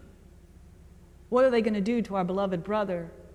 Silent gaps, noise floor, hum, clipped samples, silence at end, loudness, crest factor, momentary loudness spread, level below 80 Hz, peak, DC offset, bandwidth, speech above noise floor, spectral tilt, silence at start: none; -52 dBFS; none; under 0.1%; 0 s; -27 LUFS; 16 dB; 7 LU; -54 dBFS; -12 dBFS; under 0.1%; 10.5 kHz; 26 dB; -7.5 dB/octave; 0 s